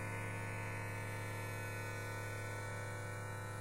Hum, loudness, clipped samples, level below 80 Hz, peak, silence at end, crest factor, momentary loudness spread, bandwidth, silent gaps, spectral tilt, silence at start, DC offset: none; -44 LUFS; under 0.1%; -60 dBFS; -32 dBFS; 0 s; 12 dB; 2 LU; 16 kHz; none; -5 dB/octave; 0 s; under 0.1%